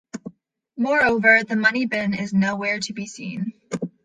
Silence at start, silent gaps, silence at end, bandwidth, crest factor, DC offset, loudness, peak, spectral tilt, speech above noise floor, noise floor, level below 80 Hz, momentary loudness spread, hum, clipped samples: 0.15 s; none; 0.15 s; 9.6 kHz; 20 dB; under 0.1%; -20 LUFS; -2 dBFS; -5 dB/octave; 32 dB; -53 dBFS; -58 dBFS; 16 LU; none; under 0.1%